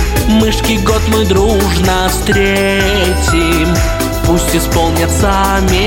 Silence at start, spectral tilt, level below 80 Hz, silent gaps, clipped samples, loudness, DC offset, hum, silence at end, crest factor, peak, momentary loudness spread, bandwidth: 0 s; -4.5 dB/octave; -18 dBFS; none; under 0.1%; -11 LUFS; under 0.1%; none; 0 s; 10 dB; -2 dBFS; 2 LU; 17 kHz